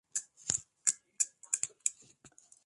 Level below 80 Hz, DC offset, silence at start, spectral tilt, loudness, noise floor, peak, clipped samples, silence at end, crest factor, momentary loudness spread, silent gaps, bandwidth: -74 dBFS; under 0.1%; 0.15 s; 1 dB/octave; -34 LUFS; -62 dBFS; -8 dBFS; under 0.1%; 0.4 s; 30 dB; 4 LU; none; 12 kHz